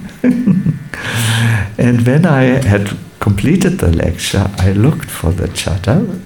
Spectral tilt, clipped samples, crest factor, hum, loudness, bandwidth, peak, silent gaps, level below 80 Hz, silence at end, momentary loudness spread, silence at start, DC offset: -6 dB/octave; under 0.1%; 12 dB; none; -13 LUFS; 19 kHz; 0 dBFS; none; -30 dBFS; 0 s; 7 LU; 0 s; 0.2%